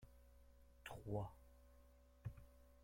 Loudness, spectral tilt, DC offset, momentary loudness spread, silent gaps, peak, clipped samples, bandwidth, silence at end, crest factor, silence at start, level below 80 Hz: -53 LUFS; -7 dB/octave; under 0.1%; 21 LU; none; -32 dBFS; under 0.1%; 16.5 kHz; 0 s; 22 dB; 0 s; -66 dBFS